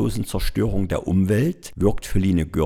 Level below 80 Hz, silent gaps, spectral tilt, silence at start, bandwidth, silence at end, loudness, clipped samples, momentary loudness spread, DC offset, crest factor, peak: -32 dBFS; none; -7 dB/octave; 0 s; 16.5 kHz; 0 s; -22 LUFS; under 0.1%; 5 LU; under 0.1%; 16 dB; -6 dBFS